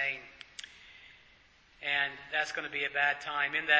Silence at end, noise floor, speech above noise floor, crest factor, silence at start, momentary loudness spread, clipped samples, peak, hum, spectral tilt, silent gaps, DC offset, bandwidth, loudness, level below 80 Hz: 0 s; -62 dBFS; 31 dB; 24 dB; 0 s; 21 LU; under 0.1%; -10 dBFS; none; -1.5 dB/octave; none; under 0.1%; 8 kHz; -32 LUFS; -72 dBFS